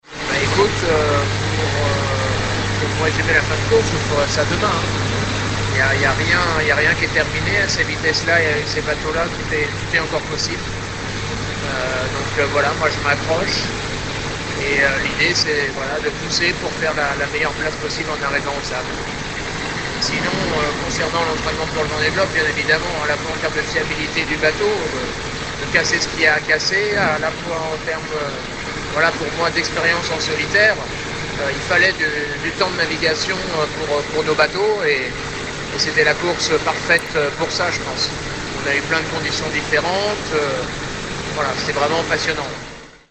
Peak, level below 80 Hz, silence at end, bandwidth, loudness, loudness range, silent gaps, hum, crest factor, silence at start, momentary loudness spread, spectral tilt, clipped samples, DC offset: 0 dBFS; -36 dBFS; 0.15 s; 9.8 kHz; -18 LUFS; 4 LU; none; none; 18 dB; 0.05 s; 8 LU; -3.5 dB/octave; under 0.1%; under 0.1%